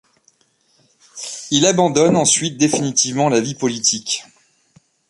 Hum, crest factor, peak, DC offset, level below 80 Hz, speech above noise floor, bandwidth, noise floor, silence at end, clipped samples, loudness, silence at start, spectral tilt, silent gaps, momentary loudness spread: none; 18 dB; 0 dBFS; under 0.1%; -60 dBFS; 44 dB; 11.5 kHz; -61 dBFS; 0.85 s; under 0.1%; -16 LUFS; 1.15 s; -3.5 dB/octave; none; 10 LU